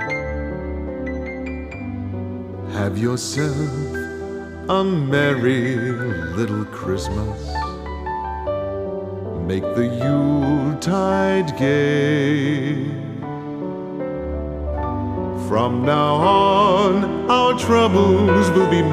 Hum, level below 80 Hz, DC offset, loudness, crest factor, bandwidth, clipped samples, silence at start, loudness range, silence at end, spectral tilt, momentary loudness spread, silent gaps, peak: none; -36 dBFS; under 0.1%; -20 LUFS; 16 dB; 15 kHz; under 0.1%; 0 s; 8 LU; 0 s; -6.5 dB/octave; 13 LU; none; -2 dBFS